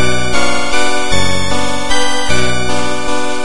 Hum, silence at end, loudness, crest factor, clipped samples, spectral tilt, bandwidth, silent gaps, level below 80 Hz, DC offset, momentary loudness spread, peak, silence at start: none; 0 s; -15 LUFS; 14 dB; under 0.1%; -3 dB/octave; 11.5 kHz; none; -30 dBFS; 40%; 3 LU; 0 dBFS; 0 s